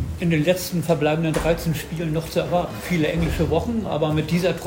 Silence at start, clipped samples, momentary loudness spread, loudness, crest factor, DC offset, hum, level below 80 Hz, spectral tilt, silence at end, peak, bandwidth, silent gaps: 0 s; under 0.1%; 5 LU; -22 LUFS; 16 dB; under 0.1%; none; -38 dBFS; -6 dB/octave; 0 s; -6 dBFS; 16.5 kHz; none